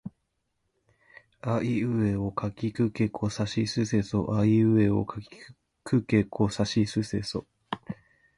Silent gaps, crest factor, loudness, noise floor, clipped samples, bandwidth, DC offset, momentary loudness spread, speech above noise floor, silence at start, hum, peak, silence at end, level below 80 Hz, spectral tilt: none; 18 dB; -27 LUFS; -77 dBFS; under 0.1%; 11.5 kHz; under 0.1%; 16 LU; 51 dB; 0.05 s; none; -10 dBFS; 0.45 s; -52 dBFS; -7 dB/octave